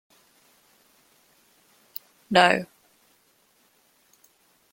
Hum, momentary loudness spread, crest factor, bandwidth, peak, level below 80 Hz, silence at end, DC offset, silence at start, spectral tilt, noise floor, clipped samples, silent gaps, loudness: none; 22 LU; 28 dB; 16.5 kHz; -2 dBFS; -72 dBFS; 2.1 s; under 0.1%; 2.3 s; -4 dB/octave; -64 dBFS; under 0.1%; none; -21 LUFS